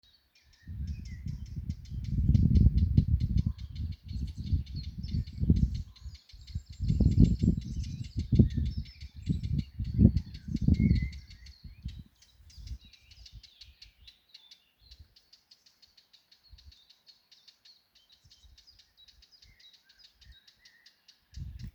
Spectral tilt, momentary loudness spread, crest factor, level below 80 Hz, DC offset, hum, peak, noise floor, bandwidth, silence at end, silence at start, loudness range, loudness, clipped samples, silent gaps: -8.5 dB/octave; 26 LU; 26 dB; -38 dBFS; under 0.1%; none; -6 dBFS; -65 dBFS; 7.8 kHz; 0.05 s; 0.65 s; 21 LU; -30 LUFS; under 0.1%; none